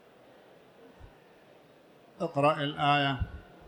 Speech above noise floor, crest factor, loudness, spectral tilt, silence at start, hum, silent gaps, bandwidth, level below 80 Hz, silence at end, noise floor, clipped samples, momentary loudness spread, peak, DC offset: 30 dB; 20 dB; -29 LUFS; -6.5 dB/octave; 1 s; none; none; 19 kHz; -50 dBFS; 0.05 s; -58 dBFS; under 0.1%; 12 LU; -14 dBFS; under 0.1%